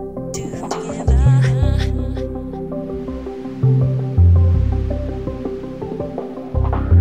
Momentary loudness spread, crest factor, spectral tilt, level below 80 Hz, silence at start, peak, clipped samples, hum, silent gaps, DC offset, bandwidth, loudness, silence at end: 13 LU; 14 dB; -8 dB/octave; -24 dBFS; 0 s; -2 dBFS; under 0.1%; none; none; 0.5%; 9 kHz; -19 LUFS; 0 s